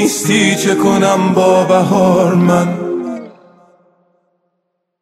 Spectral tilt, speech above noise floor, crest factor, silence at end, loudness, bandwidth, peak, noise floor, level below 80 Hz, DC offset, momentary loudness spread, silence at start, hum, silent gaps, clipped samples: -5 dB/octave; 59 dB; 14 dB; 1.7 s; -12 LUFS; 15 kHz; 0 dBFS; -70 dBFS; -54 dBFS; under 0.1%; 9 LU; 0 s; none; none; under 0.1%